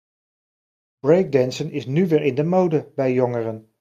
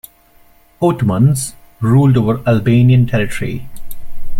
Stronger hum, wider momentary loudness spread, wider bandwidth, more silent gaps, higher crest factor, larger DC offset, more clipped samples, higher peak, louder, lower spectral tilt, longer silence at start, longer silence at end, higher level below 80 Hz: neither; second, 9 LU vs 12 LU; second, 13.5 kHz vs 15.5 kHz; neither; first, 18 dB vs 12 dB; neither; neither; second, -4 dBFS vs 0 dBFS; second, -20 LUFS vs -14 LUFS; about the same, -7.5 dB/octave vs -7 dB/octave; first, 1.05 s vs 0.8 s; first, 0.2 s vs 0 s; second, -64 dBFS vs -32 dBFS